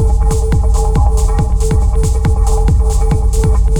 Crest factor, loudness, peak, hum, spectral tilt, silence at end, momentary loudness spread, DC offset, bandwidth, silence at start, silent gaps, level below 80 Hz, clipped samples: 8 dB; -14 LUFS; -2 dBFS; none; -6.5 dB/octave; 0 s; 1 LU; under 0.1%; 12.5 kHz; 0 s; none; -10 dBFS; under 0.1%